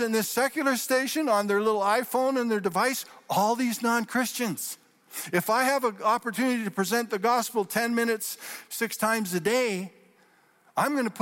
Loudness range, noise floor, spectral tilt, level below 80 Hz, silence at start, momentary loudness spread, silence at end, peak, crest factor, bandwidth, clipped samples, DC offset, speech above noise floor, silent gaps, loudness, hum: 3 LU; -62 dBFS; -3.5 dB/octave; -74 dBFS; 0 s; 9 LU; 0 s; -12 dBFS; 14 dB; 16.5 kHz; under 0.1%; under 0.1%; 35 dB; none; -26 LUFS; none